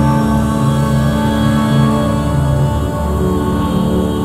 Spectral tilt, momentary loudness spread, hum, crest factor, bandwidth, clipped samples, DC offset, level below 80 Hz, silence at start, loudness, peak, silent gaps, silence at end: -7 dB/octave; 3 LU; none; 14 dB; 16 kHz; under 0.1%; under 0.1%; -24 dBFS; 0 s; -14 LUFS; 0 dBFS; none; 0 s